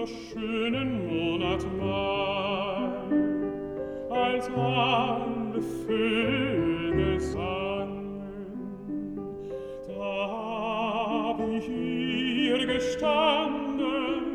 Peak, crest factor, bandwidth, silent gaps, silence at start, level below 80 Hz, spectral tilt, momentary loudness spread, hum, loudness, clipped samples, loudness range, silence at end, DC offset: -10 dBFS; 18 dB; 13 kHz; none; 0 s; -48 dBFS; -6 dB/octave; 11 LU; none; -29 LUFS; under 0.1%; 6 LU; 0 s; under 0.1%